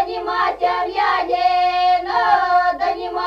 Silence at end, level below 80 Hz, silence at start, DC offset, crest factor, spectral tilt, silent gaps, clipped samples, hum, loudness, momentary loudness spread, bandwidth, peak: 0 s; -50 dBFS; 0 s; under 0.1%; 14 dB; -3.5 dB/octave; none; under 0.1%; 50 Hz at -50 dBFS; -17 LUFS; 5 LU; 7 kHz; -4 dBFS